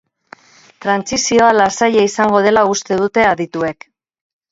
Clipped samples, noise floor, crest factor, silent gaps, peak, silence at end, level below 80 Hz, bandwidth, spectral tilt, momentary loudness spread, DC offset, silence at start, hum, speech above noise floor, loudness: under 0.1%; -43 dBFS; 16 dB; none; 0 dBFS; 0.8 s; -52 dBFS; 8 kHz; -3.5 dB/octave; 9 LU; under 0.1%; 0.8 s; none; 30 dB; -14 LUFS